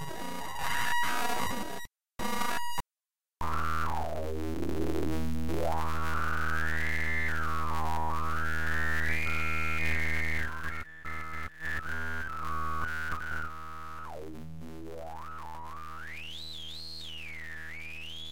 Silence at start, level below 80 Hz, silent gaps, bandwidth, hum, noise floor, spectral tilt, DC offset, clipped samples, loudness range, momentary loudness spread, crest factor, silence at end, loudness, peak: 0 s; -44 dBFS; none; 17 kHz; none; under -90 dBFS; -4.5 dB/octave; 2%; under 0.1%; 10 LU; 13 LU; 16 dB; 0 s; -34 LUFS; -16 dBFS